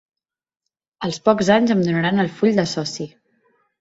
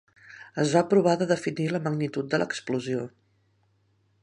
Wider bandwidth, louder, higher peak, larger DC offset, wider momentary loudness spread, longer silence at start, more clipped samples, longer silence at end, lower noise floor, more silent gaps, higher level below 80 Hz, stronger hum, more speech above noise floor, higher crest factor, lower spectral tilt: second, 8 kHz vs 11 kHz; first, -19 LUFS vs -26 LUFS; first, -2 dBFS vs -6 dBFS; neither; about the same, 13 LU vs 12 LU; first, 1 s vs 0.3 s; neither; second, 0.75 s vs 1.15 s; first, -88 dBFS vs -68 dBFS; neither; first, -58 dBFS vs -72 dBFS; neither; first, 70 dB vs 42 dB; about the same, 20 dB vs 20 dB; about the same, -5.5 dB/octave vs -6 dB/octave